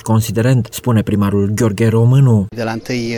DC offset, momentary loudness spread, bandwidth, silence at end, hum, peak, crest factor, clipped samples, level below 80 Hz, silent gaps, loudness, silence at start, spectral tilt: under 0.1%; 9 LU; 18.5 kHz; 0 s; none; -4 dBFS; 10 dB; under 0.1%; -44 dBFS; none; -14 LUFS; 0.05 s; -7 dB/octave